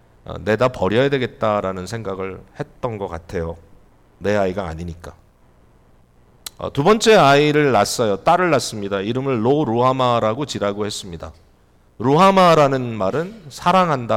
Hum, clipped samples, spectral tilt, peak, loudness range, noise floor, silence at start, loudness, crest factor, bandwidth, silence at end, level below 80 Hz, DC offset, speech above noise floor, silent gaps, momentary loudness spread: none; under 0.1%; -5.5 dB/octave; -6 dBFS; 10 LU; -53 dBFS; 0.3 s; -18 LUFS; 14 dB; 16.5 kHz; 0 s; -46 dBFS; under 0.1%; 36 dB; none; 18 LU